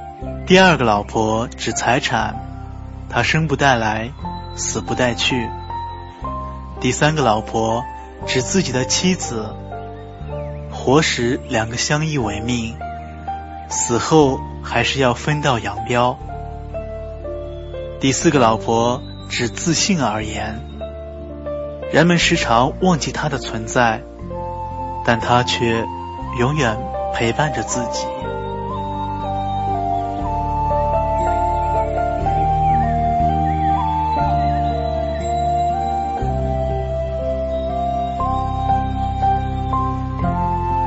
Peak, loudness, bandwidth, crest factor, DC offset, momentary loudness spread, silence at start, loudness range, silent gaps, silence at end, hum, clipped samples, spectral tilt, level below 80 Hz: 0 dBFS; -19 LUFS; 8.2 kHz; 20 dB; under 0.1%; 14 LU; 0 s; 3 LU; none; 0 s; none; under 0.1%; -4.5 dB/octave; -32 dBFS